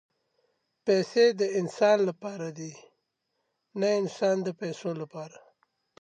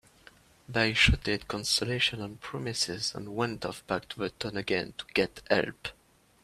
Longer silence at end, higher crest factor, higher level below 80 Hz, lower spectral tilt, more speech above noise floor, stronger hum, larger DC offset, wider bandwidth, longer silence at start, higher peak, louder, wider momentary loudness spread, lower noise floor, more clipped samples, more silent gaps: first, 0.75 s vs 0.5 s; about the same, 18 dB vs 22 dB; second, -84 dBFS vs -44 dBFS; first, -5 dB/octave vs -3.5 dB/octave; first, 53 dB vs 27 dB; neither; neither; second, 9.6 kHz vs 15 kHz; first, 0.85 s vs 0.7 s; about the same, -10 dBFS vs -8 dBFS; about the same, -27 LUFS vs -29 LUFS; first, 18 LU vs 13 LU; first, -80 dBFS vs -58 dBFS; neither; neither